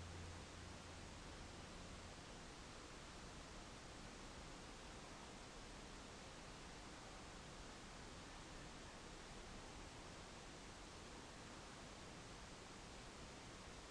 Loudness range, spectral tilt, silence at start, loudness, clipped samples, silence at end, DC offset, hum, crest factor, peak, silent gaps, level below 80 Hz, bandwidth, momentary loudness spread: 0 LU; -3.5 dB/octave; 0 s; -56 LUFS; under 0.1%; 0 s; under 0.1%; none; 14 dB; -42 dBFS; none; -64 dBFS; 11 kHz; 1 LU